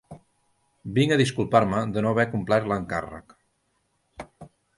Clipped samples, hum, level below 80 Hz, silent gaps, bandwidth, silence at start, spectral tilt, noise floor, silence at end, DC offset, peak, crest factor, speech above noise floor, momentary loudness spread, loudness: under 0.1%; none; -54 dBFS; none; 11.5 kHz; 0.1 s; -6 dB/octave; -72 dBFS; 0.3 s; under 0.1%; -4 dBFS; 22 dB; 48 dB; 23 LU; -24 LUFS